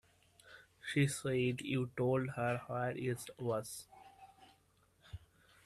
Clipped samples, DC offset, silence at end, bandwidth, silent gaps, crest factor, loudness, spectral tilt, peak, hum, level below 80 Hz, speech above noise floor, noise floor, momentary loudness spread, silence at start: under 0.1%; under 0.1%; 0.5 s; 13.5 kHz; none; 20 dB; -38 LUFS; -5.5 dB/octave; -20 dBFS; none; -68 dBFS; 35 dB; -72 dBFS; 23 LU; 0.45 s